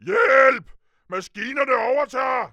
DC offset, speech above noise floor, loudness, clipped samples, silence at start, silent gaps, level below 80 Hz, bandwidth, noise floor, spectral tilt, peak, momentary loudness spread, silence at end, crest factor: under 0.1%; 24 dB; -19 LUFS; under 0.1%; 0.05 s; none; -60 dBFS; 9 kHz; -47 dBFS; -4 dB/octave; -2 dBFS; 16 LU; 0.05 s; 18 dB